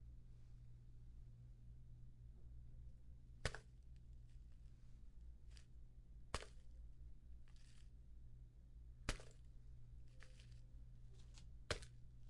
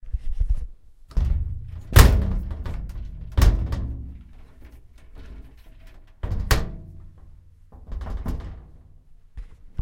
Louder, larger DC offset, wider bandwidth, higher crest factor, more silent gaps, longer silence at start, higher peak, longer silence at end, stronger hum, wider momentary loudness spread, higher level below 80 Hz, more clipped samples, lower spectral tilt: second, -59 LUFS vs -24 LUFS; neither; second, 11 kHz vs 16.5 kHz; first, 32 dB vs 24 dB; neither; about the same, 0 s vs 0.05 s; second, -24 dBFS vs 0 dBFS; about the same, 0 s vs 0 s; neither; second, 14 LU vs 27 LU; second, -60 dBFS vs -26 dBFS; neither; about the same, -4 dB/octave vs -5 dB/octave